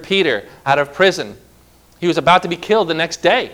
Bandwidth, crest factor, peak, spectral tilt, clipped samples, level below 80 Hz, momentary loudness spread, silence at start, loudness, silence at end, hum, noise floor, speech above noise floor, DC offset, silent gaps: 16.5 kHz; 16 dB; 0 dBFS; -4 dB/octave; under 0.1%; -50 dBFS; 8 LU; 0 s; -16 LUFS; 0 s; none; -49 dBFS; 33 dB; under 0.1%; none